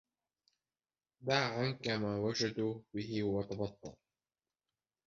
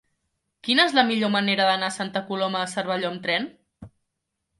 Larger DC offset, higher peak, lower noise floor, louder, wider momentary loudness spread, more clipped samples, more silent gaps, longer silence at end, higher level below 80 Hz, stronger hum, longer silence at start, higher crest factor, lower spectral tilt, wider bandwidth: neither; second, -18 dBFS vs -4 dBFS; first, under -90 dBFS vs -80 dBFS; second, -37 LUFS vs -23 LUFS; about the same, 10 LU vs 9 LU; neither; neither; first, 1.15 s vs 0.7 s; about the same, -68 dBFS vs -66 dBFS; neither; first, 1.2 s vs 0.65 s; about the same, 20 dB vs 20 dB; about the same, -4 dB/octave vs -4 dB/octave; second, 7.6 kHz vs 11.5 kHz